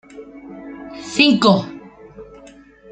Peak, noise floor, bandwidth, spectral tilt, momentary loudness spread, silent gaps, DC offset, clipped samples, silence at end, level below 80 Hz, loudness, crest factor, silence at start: -2 dBFS; -44 dBFS; 9.2 kHz; -5 dB/octave; 26 LU; none; under 0.1%; under 0.1%; 0.7 s; -56 dBFS; -15 LUFS; 20 dB; 0.15 s